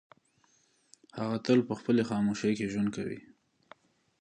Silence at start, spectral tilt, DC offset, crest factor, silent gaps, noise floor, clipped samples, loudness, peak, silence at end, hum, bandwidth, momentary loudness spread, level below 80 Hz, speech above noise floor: 1.15 s; -6.5 dB/octave; under 0.1%; 20 dB; none; -69 dBFS; under 0.1%; -30 LUFS; -12 dBFS; 1 s; none; 10 kHz; 12 LU; -68 dBFS; 40 dB